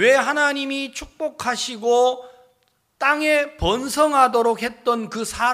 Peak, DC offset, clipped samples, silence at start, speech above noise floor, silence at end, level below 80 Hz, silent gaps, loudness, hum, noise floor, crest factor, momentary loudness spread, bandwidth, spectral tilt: -2 dBFS; under 0.1%; under 0.1%; 0 s; 45 dB; 0 s; -44 dBFS; none; -20 LUFS; none; -65 dBFS; 18 dB; 11 LU; 15.5 kHz; -3 dB/octave